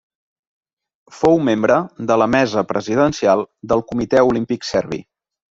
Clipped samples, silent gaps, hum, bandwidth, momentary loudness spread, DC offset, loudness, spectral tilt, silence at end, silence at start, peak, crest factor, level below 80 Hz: under 0.1%; none; none; 7.8 kHz; 6 LU; under 0.1%; -17 LUFS; -6 dB/octave; 0.5 s; 1.1 s; -2 dBFS; 16 dB; -50 dBFS